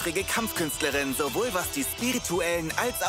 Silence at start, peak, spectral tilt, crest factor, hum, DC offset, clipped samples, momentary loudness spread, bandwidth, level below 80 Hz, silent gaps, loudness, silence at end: 0 s; -10 dBFS; -2.5 dB/octave; 18 dB; none; under 0.1%; under 0.1%; 2 LU; 16 kHz; -48 dBFS; none; -27 LUFS; 0 s